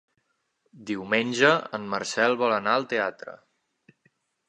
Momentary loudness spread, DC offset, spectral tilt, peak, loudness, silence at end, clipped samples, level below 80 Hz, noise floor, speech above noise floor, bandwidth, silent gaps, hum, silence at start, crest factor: 16 LU; under 0.1%; -4 dB/octave; -4 dBFS; -24 LUFS; 1.1 s; under 0.1%; -74 dBFS; -74 dBFS; 49 dB; 10 kHz; none; none; 0.75 s; 24 dB